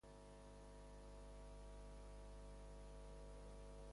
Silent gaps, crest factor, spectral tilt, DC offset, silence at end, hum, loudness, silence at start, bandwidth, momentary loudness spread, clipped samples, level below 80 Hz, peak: none; 10 dB; -5.5 dB/octave; under 0.1%; 0 s; 50 Hz at -60 dBFS; -60 LUFS; 0.05 s; 11.5 kHz; 2 LU; under 0.1%; -60 dBFS; -48 dBFS